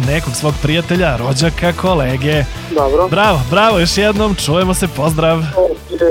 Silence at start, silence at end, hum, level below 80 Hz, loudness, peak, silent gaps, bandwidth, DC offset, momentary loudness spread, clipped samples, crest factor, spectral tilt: 0 s; 0 s; none; -28 dBFS; -14 LUFS; 0 dBFS; none; 17 kHz; under 0.1%; 5 LU; under 0.1%; 12 dB; -5 dB/octave